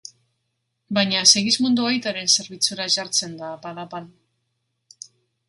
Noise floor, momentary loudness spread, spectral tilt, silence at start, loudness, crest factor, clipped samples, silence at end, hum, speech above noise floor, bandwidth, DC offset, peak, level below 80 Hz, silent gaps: -75 dBFS; 20 LU; -1.5 dB/octave; 0.9 s; -18 LUFS; 24 dB; under 0.1%; 1.4 s; none; 54 dB; 16 kHz; under 0.1%; 0 dBFS; -68 dBFS; none